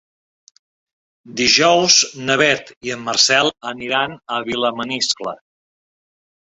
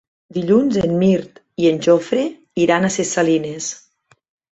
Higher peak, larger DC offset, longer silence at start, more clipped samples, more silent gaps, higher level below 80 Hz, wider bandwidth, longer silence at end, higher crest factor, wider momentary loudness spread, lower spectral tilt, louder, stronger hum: about the same, 0 dBFS vs -2 dBFS; neither; first, 1.25 s vs 0.35 s; neither; first, 2.77-2.81 s vs none; about the same, -58 dBFS vs -54 dBFS; about the same, 8.4 kHz vs 8.2 kHz; first, 1.25 s vs 0.75 s; about the same, 20 dB vs 16 dB; first, 14 LU vs 11 LU; second, -1.5 dB/octave vs -5.5 dB/octave; about the same, -16 LUFS vs -18 LUFS; neither